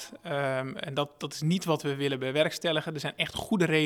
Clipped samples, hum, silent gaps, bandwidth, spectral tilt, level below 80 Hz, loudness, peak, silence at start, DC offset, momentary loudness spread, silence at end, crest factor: under 0.1%; none; none; 18.5 kHz; -5 dB/octave; -64 dBFS; -30 LUFS; -8 dBFS; 0 s; under 0.1%; 6 LU; 0 s; 20 dB